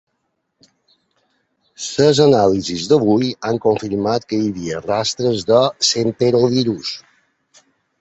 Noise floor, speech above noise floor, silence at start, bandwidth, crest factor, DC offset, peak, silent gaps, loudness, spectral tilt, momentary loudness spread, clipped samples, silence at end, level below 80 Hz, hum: -71 dBFS; 55 dB; 1.8 s; 8.2 kHz; 18 dB; under 0.1%; 0 dBFS; none; -17 LUFS; -5 dB/octave; 11 LU; under 0.1%; 1 s; -52 dBFS; none